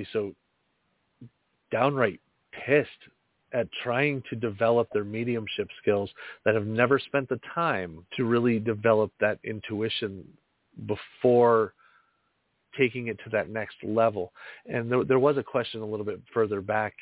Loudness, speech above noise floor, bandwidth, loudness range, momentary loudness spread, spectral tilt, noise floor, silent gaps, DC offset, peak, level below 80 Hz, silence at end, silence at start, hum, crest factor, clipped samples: -27 LUFS; 47 dB; 4 kHz; 3 LU; 11 LU; -10 dB/octave; -74 dBFS; none; under 0.1%; -6 dBFS; -62 dBFS; 0 s; 0 s; none; 22 dB; under 0.1%